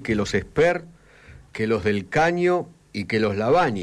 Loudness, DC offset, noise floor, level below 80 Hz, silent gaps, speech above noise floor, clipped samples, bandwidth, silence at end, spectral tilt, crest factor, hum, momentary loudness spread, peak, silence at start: -22 LUFS; under 0.1%; -48 dBFS; -48 dBFS; none; 26 dB; under 0.1%; 11 kHz; 0 s; -6 dB/octave; 12 dB; none; 10 LU; -12 dBFS; 0 s